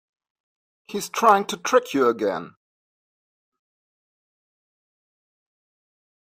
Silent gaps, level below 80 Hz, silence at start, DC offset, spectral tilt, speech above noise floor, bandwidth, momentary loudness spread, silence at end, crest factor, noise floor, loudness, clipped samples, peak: none; -74 dBFS; 0.9 s; under 0.1%; -3.5 dB/octave; over 69 dB; 15.5 kHz; 14 LU; 3.9 s; 24 dB; under -90 dBFS; -21 LUFS; under 0.1%; -4 dBFS